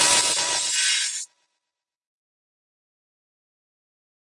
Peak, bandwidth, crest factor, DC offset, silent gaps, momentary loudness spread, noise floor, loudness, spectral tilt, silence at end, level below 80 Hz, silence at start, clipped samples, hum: -6 dBFS; 11.5 kHz; 22 dB; under 0.1%; none; 14 LU; -86 dBFS; -20 LUFS; 2 dB/octave; 3 s; -66 dBFS; 0 s; under 0.1%; none